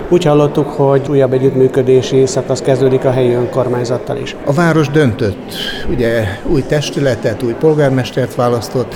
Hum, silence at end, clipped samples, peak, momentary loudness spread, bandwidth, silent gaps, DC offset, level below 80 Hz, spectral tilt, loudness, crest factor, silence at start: none; 0 s; under 0.1%; 0 dBFS; 7 LU; 17 kHz; none; under 0.1%; -34 dBFS; -6.5 dB/octave; -13 LUFS; 12 dB; 0 s